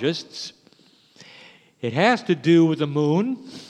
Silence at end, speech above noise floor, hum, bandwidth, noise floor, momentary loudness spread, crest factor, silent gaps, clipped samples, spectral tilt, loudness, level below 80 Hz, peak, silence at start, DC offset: 0.05 s; 35 dB; none; 9.2 kHz; -56 dBFS; 17 LU; 20 dB; none; under 0.1%; -6.5 dB/octave; -21 LUFS; -74 dBFS; -2 dBFS; 0 s; under 0.1%